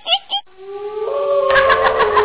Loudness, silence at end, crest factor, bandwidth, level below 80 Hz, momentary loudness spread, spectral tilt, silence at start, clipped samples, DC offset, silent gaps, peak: -15 LUFS; 0 s; 14 dB; 4 kHz; -44 dBFS; 16 LU; -6.5 dB/octave; 0.05 s; under 0.1%; under 0.1%; none; -4 dBFS